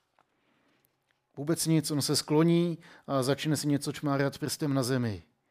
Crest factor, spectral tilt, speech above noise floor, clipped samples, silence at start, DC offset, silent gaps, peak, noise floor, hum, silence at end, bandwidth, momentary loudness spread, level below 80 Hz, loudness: 16 dB; -5 dB/octave; 46 dB; under 0.1%; 1.35 s; under 0.1%; none; -14 dBFS; -74 dBFS; none; 0.3 s; 16 kHz; 8 LU; -68 dBFS; -29 LUFS